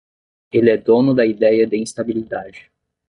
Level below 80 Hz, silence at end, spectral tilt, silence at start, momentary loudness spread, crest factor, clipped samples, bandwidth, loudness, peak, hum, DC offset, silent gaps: -56 dBFS; 0.5 s; -6.5 dB/octave; 0.55 s; 13 LU; 16 dB; under 0.1%; 11 kHz; -16 LUFS; -2 dBFS; none; under 0.1%; none